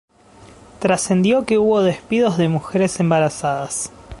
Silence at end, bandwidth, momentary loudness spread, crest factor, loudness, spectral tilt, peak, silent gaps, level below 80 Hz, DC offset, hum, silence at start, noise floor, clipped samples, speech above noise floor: 0.05 s; 11.5 kHz; 7 LU; 16 dB; -18 LUFS; -5.5 dB/octave; -2 dBFS; none; -48 dBFS; under 0.1%; none; 0.4 s; -46 dBFS; under 0.1%; 28 dB